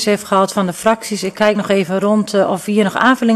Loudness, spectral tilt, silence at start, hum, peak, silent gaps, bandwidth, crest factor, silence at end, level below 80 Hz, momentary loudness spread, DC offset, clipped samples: -15 LUFS; -5 dB/octave; 0 s; none; 0 dBFS; none; 13.5 kHz; 14 dB; 0 s; -56 dBFS; 4 LU; under 0.1%; under 0.1%